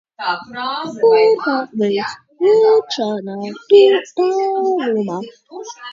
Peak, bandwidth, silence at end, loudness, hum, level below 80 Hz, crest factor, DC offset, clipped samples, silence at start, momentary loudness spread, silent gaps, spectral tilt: 0 dBFS; 7.6 kHz; 0 s; -16 LUFS; none; -68 dBFS; 16 dB; under 0.1%; under 0.1%; 0.2 s; 16 LU; none; -5 dB/octave